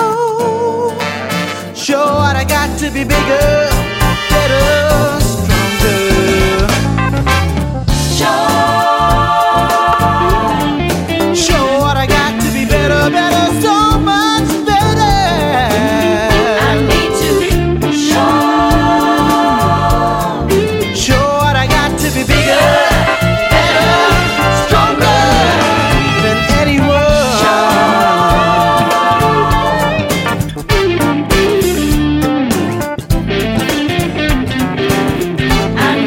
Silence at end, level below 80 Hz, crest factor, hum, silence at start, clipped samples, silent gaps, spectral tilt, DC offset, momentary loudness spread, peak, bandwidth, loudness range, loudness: 0 s; -22 dBFS; 10 dB; none; 0 s; under 0.1%; none; -5 dB/octave; under 0.1%; 5 LU; 0 dBFS; 16.5 kHz; 3 LU; -11 LUFS